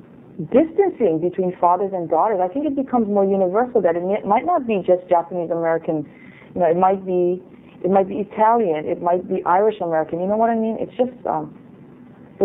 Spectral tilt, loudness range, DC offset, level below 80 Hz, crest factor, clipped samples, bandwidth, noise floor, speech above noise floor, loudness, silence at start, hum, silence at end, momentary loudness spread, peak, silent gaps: -11 dB/octave; 2 LU; under 0.1%; -60 dBFS; 16 dB; under 0.1%; 3.9 kHz; -43 dBFS; 24 dB; -20 LUFS; 0.3 s; none; 0 s; 7 LU; -2 dBFS; none